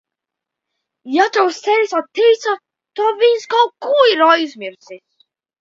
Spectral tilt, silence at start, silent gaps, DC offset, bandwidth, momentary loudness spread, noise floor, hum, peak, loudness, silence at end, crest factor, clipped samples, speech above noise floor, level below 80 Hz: -2 dB/octave; 1.05 s; none; under 0.1%; 7.6 kHz; 13 LU; -83 dBFS; none; 0 dBFS; -15 LUFS; 0.65 s; 16 dB; under 0.1%; 68 dB; -74 dBFS